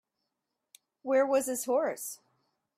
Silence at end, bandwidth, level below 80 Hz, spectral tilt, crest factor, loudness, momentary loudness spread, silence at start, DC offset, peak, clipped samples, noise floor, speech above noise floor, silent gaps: 0.65 s; 16 kHz; -82 dBFS; -2.5 dB/octave; 18 dB; -30 LUFS; 16 LU; 1.05 s; under 0.1%; -16 dBFS; under 0.1%; -85 dBFS; 56 dB; none